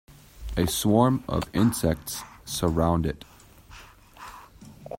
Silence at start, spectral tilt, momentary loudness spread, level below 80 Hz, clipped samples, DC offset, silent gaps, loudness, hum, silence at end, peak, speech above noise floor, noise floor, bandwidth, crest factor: 0.1 s; -5.5 dB/octave; 22 LU; -42 dBFS; under 0.1%; under 0.1%; none; -25 LUFS; none; 0 s; -6 dBFS; 25 dB; -49 dBFS; 16.5 kHz; 22 dB